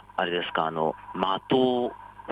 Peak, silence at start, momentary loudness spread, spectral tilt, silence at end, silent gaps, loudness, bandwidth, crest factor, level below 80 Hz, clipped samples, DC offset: -10 dBFS; 0.15 s; 7 LU; -7 dB/octave; 0 s; none; -27 LUFS; 8.8 kHz; 18 dB; -62 dBFS; under 0.1%; under 0.1%